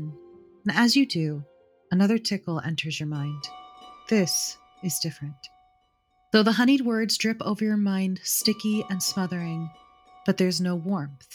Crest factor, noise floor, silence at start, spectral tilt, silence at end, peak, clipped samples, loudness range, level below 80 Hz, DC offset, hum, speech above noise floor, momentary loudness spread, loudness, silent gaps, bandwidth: 20 dB; -67 dBFS; 0 s; -4.5 dB/octave; 0 s; -6 dBFS; under 0.1%; 5 LU; -70 dBFS; under 0.1%; none; 43 dB; 15 LU; -25 LUFS; none; 20 kHz